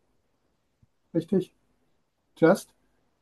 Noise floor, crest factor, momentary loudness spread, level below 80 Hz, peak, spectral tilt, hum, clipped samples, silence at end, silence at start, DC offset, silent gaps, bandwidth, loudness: -74 dBFS; 22 dB; 10 LU; -68 dBFS; -8 dBFS; -7 dB/octave; none; under 0.1%; 0.6 s; 1.15 s; under 0.1%; none; 12.5 kHz; -26 LUFS